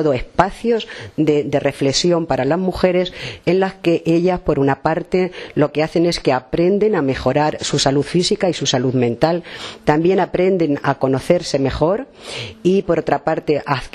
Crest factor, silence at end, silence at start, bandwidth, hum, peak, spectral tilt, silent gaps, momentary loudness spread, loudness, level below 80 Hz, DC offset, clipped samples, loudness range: 16 dB; 0.05 s; 0 s; 12.5 kHz; none; 0 dBFS; -5.5 dB/octave; none; 4 LU; -17 LUFS; -40 dBFS; under 0.1%; under 0.1%; 1 LU